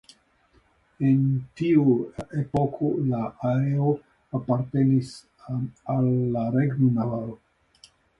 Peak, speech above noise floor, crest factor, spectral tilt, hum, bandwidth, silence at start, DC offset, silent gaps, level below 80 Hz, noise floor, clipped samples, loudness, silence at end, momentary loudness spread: -8 dBFS; 39 dB; 16 dB; -9.5 dB/octave; none; 10.5 kHz; 1 s; under 0.1%; none; -56 dBFS; -62 dBFS; under 0.1%; -25 LUFS; 0.85 s; 11 LU